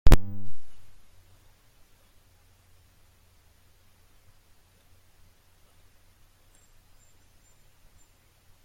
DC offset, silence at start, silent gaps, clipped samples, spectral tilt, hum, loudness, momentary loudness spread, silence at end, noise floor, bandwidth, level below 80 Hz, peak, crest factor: under 0.1%; 0.05 s; none; under 0.1%; -6 dB/octave; none; -29 LUFS; 30 LU; 7.8 s; -60 dBFS; 16.5 kHz; -32 dBFS; -2 dBFS; 22 dB